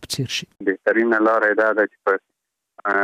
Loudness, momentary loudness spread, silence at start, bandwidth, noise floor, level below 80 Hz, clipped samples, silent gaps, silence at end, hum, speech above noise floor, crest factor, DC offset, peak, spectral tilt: -20 LUFS; 8 LU; 0 s; 15.5 kHz; -52 dBFS; -62 dBFS; under 0.1%; none; 0 s; none; 33 dB; 14 dB; under 0.1%; -6 dBFS; -4.5 dB/octave